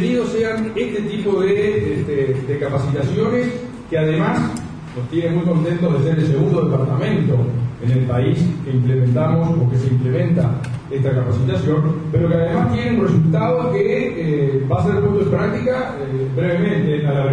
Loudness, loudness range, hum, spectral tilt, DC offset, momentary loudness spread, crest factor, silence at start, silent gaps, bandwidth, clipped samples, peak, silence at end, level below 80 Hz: -18 LUFS; 2 LU; none; -8.5 dB/octave; under 0.1%; 5 LU; 14 dB; 0 s; none; 9.8 kHz; under 0.1%; -4 dBFS; 0 s; -42 dBFS